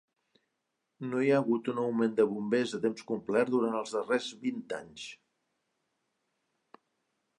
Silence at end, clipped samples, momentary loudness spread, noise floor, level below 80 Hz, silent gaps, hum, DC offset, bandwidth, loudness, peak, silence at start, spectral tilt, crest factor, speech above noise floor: 2.25 s; under 0.1%; 13 LU; -83 dBFS; -80 dBFS; none; none; under 0.1%; 11 kHz; -31 LUFS; -14 dBFS; 1 s; -5.5 dB/octave; 20 dB; 53 dB